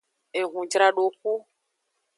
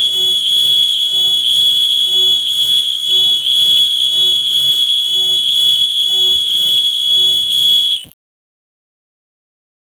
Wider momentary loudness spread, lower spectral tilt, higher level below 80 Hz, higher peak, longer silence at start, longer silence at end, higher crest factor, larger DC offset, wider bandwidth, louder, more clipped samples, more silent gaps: first, 11 LU vs 2 LU; first, -1.5 dB/octave vs 1 dB/octave; second, -86 dBFS vs -56 dBFS; about the same, -6 dBFS vs -4 dBFS; first, 0.35 s vs 0 s; second, 0.75 s vs 1.95 s; first, 20 dB vs 10 dB; neither; second, 11.5 kHz vs over 20 kHz; second, -25 LUFS vs -10 LUFS; neither; neither